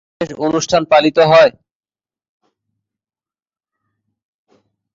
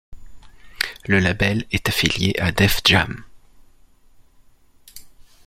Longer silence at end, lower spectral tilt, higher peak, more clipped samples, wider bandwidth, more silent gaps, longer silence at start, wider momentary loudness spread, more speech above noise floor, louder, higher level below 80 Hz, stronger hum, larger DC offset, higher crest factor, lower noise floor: first, 3.45 s vs 0.25 s; about the same, -4.5 dB/octave vs -4 dB/octave; about the same, 0 dBFS vs 0 dBFS; neither; second, 7.6 kHz vs 16.5 kHz; neither; about the same, 0.2 s vs 0.1 s; about the same, 10 LU vs 11 LU; first, over 78 dB vs 33 dB; first, -12 LUFS vs -19 LUFS; second, -54 dBFS vs -40 dBFS; neither; neither; second, 16 dB vs 22 dB; first, under -90 dBFS vs -52 dBFS